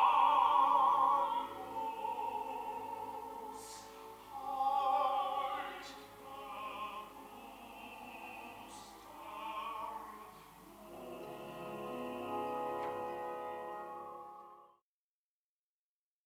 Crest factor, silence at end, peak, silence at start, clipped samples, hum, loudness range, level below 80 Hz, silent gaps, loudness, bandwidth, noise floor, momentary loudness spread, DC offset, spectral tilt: 20 dB; 1.6 s; -18 dBFS; 0 s; under 0.1%; none; 12 LU; -74 dBFS; none; -37 LUFS; 18 kHz; under -90 dBFS; 23 LU; under 0.1%; -3.5 dB/octave